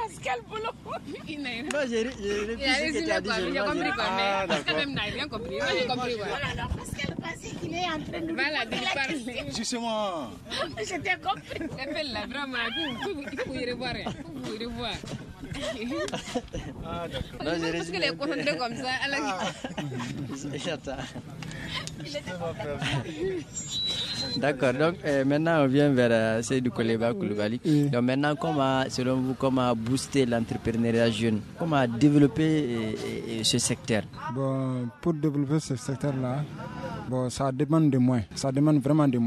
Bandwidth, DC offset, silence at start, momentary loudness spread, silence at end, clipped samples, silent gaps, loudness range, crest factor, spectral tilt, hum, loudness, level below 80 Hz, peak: 14 kHz; under 0.1%; 0 s; 11 LU; 0 s; under 0.1%; none; 8 LU; 18 dB; -5 dB/octave; none; -28 LUFS; -50 dBFS; -10 dBFS